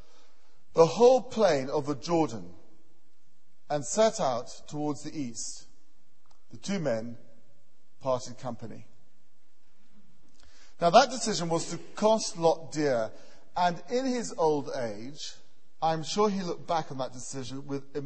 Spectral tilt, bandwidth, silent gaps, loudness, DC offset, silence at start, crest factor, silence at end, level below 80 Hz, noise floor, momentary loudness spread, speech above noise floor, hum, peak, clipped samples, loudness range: -4.5 dB/octave; 8.8 kHz; none; -29 LUFS; 1%; 0.75 s; 24 dB; 0 s; -62 dBFS; -73 dBFS; 17 LU; 45 dB; none; -6 dBFS; under 0.1%; 10 LU